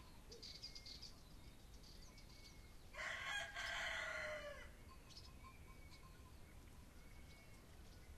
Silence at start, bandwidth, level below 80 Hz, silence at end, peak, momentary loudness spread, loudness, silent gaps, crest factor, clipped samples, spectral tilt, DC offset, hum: 0 s; 13 kHz; -62 dBFS; 0 s; -34 dBFS; 18 LU; -51 LUFS; none; 20 dB; under 0.1%; -2.5 dB/octave; under 0.1%; none